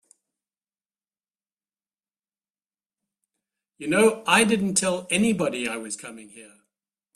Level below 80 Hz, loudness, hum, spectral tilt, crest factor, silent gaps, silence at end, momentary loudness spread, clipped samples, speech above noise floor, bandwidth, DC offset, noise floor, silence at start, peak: -66 dBFS; -22 LUFS; none; -3.5 dB/octave; 22 dB; none; 0.7 s; 16 LU; under 0.1%; over 67 dB; 13.5 kHz; under 0.1%; under -90 dBFS; 3.8 s; -4 dBFS